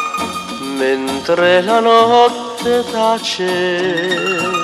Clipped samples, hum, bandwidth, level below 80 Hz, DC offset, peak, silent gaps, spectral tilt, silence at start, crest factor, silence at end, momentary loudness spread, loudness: under 0.1%; none; 14.5 kHz; -54 dBFS; under 0.1%; 0 dBFS; none; -3.5 dB/octave; 0 s; 14 dB; 0 s; 10 LU; -14 LUFS